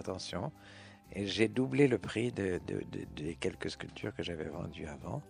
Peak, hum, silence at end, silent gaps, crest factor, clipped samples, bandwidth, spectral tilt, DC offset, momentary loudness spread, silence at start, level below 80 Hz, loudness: -14 dBFS; none; 0 s; none; 22 dB; under 0.1%; 11.5 kHz; -6 dB/octave; under 0.1%; 15 LU; 0 s; -60 dBFS; -36 LUFS